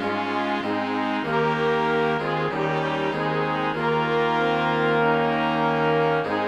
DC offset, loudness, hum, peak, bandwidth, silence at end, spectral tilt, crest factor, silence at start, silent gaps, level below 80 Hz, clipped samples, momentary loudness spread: under 0.1%; -23 LUFS; none; -8 dBFS; 9.6 kHz; 0 s; -6.5 dB/octave; 14 dB; 0 s; none; -56 dBFS; under 0.1%; 4 LU